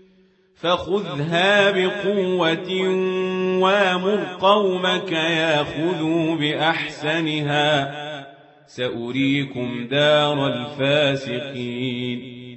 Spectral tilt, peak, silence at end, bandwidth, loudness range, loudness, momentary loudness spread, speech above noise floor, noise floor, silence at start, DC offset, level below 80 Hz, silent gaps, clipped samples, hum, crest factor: -5.5 dB/octave; -4 dBFS; 0 s; 8.4 kHz; 3 LU; -20 LUFS; 10 LU; 36 dB; -57 dBFS; 0.65 s; under 0.1%; -60 dBFS; none; under 0.1%; none; 18 dB